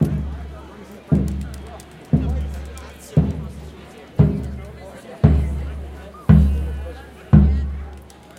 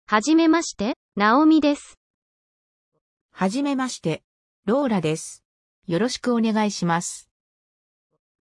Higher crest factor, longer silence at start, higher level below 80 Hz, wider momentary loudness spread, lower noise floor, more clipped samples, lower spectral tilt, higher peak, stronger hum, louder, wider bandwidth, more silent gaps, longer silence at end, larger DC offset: about the same, 20 dB vs 18 dB; about the same, 0 s vs 0.1 s; first, -26 dBFS vs -62 dBFS; first, 23 LU vs 14 LU; second, -40 dBFS vs under -90 dBFS; neither; first, -9 dB/octave vs -5 dB/octave; first, 0 dBFS vs -6 dBFS; neither; about the same, -20 LUFS vs -22 LUFS; about the same, 11 kHz vs 12 kHz; second, none vs 0.96-1.12 s, 1.97-2.92 s, 3.01-3.29 s, 4.24-4.63 s, 5.45-5.82 s; second, 0.35 s vs 1.2 s; neither